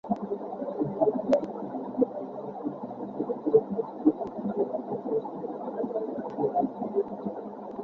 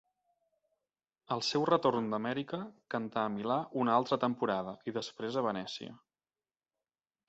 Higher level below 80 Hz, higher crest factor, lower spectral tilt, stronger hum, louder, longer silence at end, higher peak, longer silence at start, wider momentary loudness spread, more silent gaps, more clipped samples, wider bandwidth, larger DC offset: first, -68 dBFS vs -76 dBFS; about the same, 22 dB vs 22 dB; first, -9.5 dB/octave vs -4 dB/octave; neither; first, -30 LUFS vs -34 LUFS; second, 0 s vs 1.35 s; first, -8 dBFS vs -14 dBFS; second, 0.05 s vs 1.3 s; about the same, 11 LU vs 11 LU; neither; neither; second, 7 kHz vs 8 kHz; neither